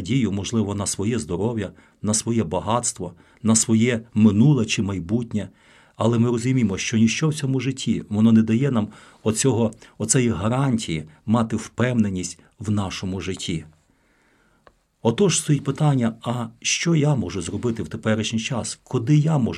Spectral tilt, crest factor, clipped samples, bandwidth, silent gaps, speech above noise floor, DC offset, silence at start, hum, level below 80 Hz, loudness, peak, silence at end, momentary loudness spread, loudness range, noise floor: -5 dB/octave; 18 dB; under 0.1%; 12.5 kHz; none; 40 dB; under 0.1%; 0 s; none; -52 dBFS; -22 LUFS; -4 dBFS; 0 s; 10 LU; 5 LU; -61 dBFS